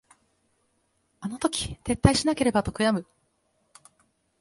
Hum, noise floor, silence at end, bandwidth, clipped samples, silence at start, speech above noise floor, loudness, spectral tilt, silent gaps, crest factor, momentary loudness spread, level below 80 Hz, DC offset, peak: none; -71 dBFS; 1.4 s; 11.5 kHz; under 0.1%; 1.2 s; 47 dB; -25 LUFS; -5 dB/octave; none; 28 dB; 10 LU; -44 dBFS; under 0.1%; 0 dBFS